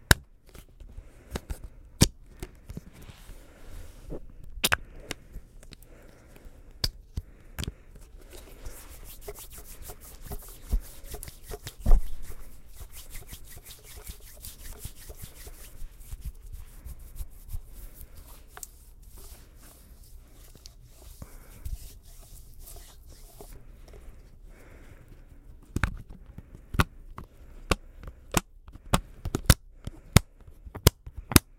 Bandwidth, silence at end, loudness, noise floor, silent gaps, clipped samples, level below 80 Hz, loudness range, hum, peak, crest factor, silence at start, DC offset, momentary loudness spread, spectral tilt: 16.5 kHz; 0.05 s; -31 LUFS; -51 dBFS; none; under 0.1%; -36 dBFS; 18 LU; none; 0 dBFS; 32 dB; 0.1 s; under 0.1%; 27 LU; -4 dB/octave